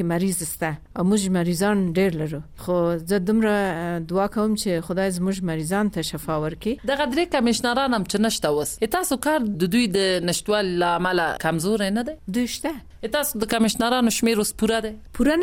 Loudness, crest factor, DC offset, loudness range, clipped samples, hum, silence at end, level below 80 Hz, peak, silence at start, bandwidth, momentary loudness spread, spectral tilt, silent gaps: -23 LUFS; 14 dB; under 0.1%; 2 LU; under 0.1%; none; 0 s; -46 dBFS; -8 dBFS; 0 s; 17 kHz; 7 LU; -4.5 dB/octave; none